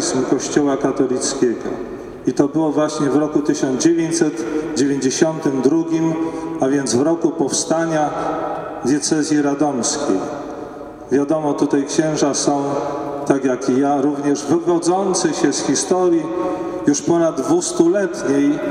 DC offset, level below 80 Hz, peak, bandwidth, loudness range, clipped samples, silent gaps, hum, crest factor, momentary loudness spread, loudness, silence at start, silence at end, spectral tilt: under 0.1%; -54 dBFS; -2 dBFS; 12.5 kHz; 2 LU; under 0.1%; none; none; 16 dB; 6 LU; -18 LUFS; 0 s; 0 s; -4.5 dB/octave